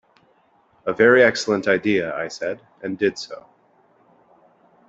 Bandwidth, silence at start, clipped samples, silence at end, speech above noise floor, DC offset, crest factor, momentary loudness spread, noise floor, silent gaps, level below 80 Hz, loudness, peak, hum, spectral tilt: 8.2 kHz; 0.85 s; under 0.1%; 1.55 s; 40 dB; under 0.1%; 20 dB; 18 LU; -59 dBFS; none; -64 dBFS; -20 LUFS; -2 dBFS; none; -4.5 dB/octave